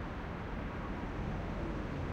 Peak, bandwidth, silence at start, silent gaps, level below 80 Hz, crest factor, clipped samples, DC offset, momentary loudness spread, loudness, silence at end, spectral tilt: -26 dBFS; 8.4 kHz; 0 s; none; -44 dBFS; 12 dB; under 0.1%; under 0.1%; 2 LU; -41 LUFS; 0 s; -7.5 dB/octave